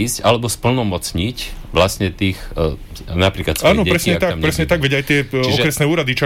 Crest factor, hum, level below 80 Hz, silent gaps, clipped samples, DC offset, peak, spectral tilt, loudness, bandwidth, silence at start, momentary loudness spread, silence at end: 14 dB; none; -32 dBFS; none; under 0.1%; under 0.1%; -4 dBFS; -4.5 dB/octave; -17 LUFS; 17 kHz; 0 s; 7 LU; 0 s